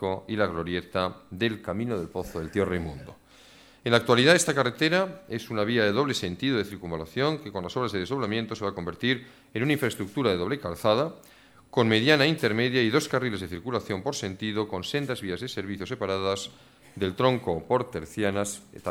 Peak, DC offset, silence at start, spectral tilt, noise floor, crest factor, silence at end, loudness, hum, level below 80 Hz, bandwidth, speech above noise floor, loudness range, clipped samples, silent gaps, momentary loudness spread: -6 dBFS; under 0.1%; 0 s; -4.5 dB/octave; -54 dBFS; 22 dB; 0 s; -27 LUFS; none; -56 dBFS; 17 kHz; 27 dB; 6 LU; under 0.1%; none; 12 LU